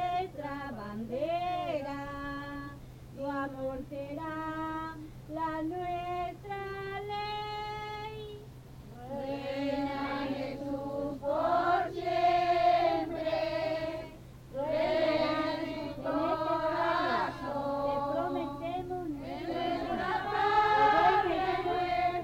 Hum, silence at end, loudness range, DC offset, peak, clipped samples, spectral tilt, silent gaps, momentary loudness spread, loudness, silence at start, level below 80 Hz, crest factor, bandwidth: none; 0 s; 9 LU; under 0.1%; -14 dBFS; under 0.1%; -6 dB/octave; none; 14 LU; -32 LUFS; 0 s; -54 dBFS; 18 dB; 17 kHz